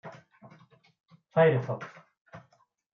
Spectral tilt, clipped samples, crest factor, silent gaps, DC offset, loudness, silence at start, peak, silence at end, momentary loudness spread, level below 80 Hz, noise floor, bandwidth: -8.5 dB/octave; under 0.1%; 20 dB; 2.21-2.25 s; under 0.1%; -27 LUFS; 0.05 s; -12 dBFS; 0.55 s; 23 LU; -78 dBFS; -67 dBFS; 6.6 kHz